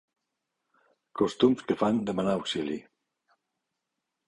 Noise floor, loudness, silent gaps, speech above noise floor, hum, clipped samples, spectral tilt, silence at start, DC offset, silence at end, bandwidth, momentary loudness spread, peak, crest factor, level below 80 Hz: -84 dBFS; -28 LUFS; none; 57 dB; none; under 0.1%; -6 dB/octave; 1.15 s; under 0.1%; 1.45 s; 11 kHz; 11 LU; -10 dBFS; 22 dB; -64 dBFS